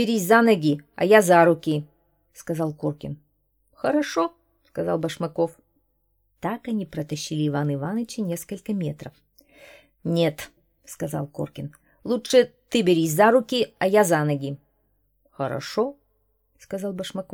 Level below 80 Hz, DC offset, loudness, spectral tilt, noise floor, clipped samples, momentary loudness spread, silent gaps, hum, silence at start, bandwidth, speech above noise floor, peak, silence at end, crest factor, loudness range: -62 dBFS; under 0.1%; -23 LUFS; -5.5 dB/octave; -69 dBFS; under 0.1%; 18 LU; none; none; 0 s; 19 kHz; 47 dB; -2 dBFS; 0.1 s; 22 dB; 9 LU